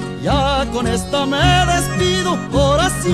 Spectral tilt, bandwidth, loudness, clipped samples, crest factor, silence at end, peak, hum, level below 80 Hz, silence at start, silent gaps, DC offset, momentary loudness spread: -4.5 dB/octave; 15 kHz; -16 LUFS; under 0.1%; 14 dB; 0 s; -2 dBFS; none; -26 dBFS; 0 s; none; 0.3%; 5 LU